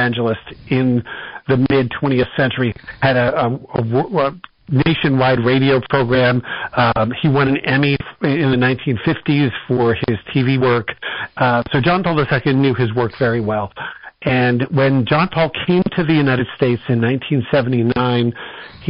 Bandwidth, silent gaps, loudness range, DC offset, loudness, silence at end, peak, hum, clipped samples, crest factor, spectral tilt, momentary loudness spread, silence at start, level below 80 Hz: 5.4 kHz; none; 2 LU; under 0.1%; -17 LUFS; 0 s; -4 dBFS; none; under 0.1%; 12 dB; -5.5 dB/octave; 7 LU; 0 s; -44 dBFS